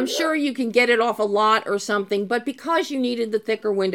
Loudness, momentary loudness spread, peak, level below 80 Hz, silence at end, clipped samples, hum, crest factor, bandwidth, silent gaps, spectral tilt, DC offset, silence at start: -21 LUFS; 6 LU; -4 dBFS; -74 dBFS; 0 s; under 0.1%; none; 16 dB; 16.5 kHz; none; -3.5 dB/octave; under 0.1%; 0 s